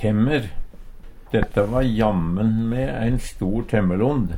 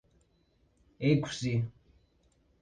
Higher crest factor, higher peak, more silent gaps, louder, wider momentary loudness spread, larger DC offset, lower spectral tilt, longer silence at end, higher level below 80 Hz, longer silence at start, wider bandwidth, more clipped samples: second, 16 dB vs 22 dB; first, -4 dBFS vs -14 dBFS; neither; first, -22 LUFS vs -31 LUFS; about the same, 6 LU vs 6 LU; neither; first, -8 dB/octave vs -6.5 dB/octave; second, 0 s vs 0.9 s; first, -32 dBFS vs -62 dBFS; second, 0 s vs 1 s; first, 15.5 kHz vs 9.6 kHz; neither